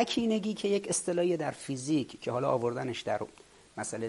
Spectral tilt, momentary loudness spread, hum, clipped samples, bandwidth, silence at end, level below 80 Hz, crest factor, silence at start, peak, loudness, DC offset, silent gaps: -4.5 dB/octave; 8 LU; none; under 0.1%; 11.5 kHz; 0 s; -68 dBFS; 18 dB; 0 s; -14 dBFS; -32 LUFS; under 0.1%; none